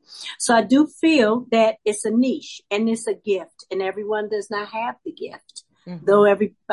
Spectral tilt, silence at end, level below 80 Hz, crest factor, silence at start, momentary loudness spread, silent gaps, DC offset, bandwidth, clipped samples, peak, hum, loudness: -4 dB/octave; 0 s; -70 dBFS; 16 dB; 0.1 s; 17 LU; none; under 0.1%; 11.5 kHz; under 0.1%; -4 dBFS; none; -20 LUFS